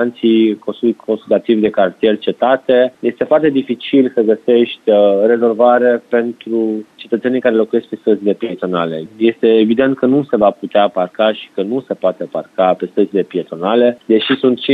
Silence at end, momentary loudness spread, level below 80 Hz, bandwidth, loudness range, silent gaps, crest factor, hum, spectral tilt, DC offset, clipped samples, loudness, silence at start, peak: 0 s; 8 LU; -62 dBFS; 4.7 kHz; 4 LU; none; 14 dB; none; -8 dB/octave; under 0.1%; under 0.1%; -14 LUFS; 0 s; 0 dBFS